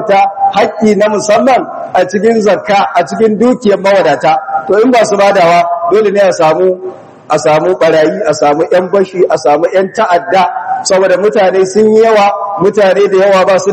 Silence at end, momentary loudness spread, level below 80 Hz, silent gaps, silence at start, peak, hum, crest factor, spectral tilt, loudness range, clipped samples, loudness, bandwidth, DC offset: 0 s; 5 LU; -54 dBFS; none; 0 s; 0 dBFS; none; 8 dB; -5 dB/octave; 2 LU; 2%; -9 LUFS; 11 kHz; under 0.1%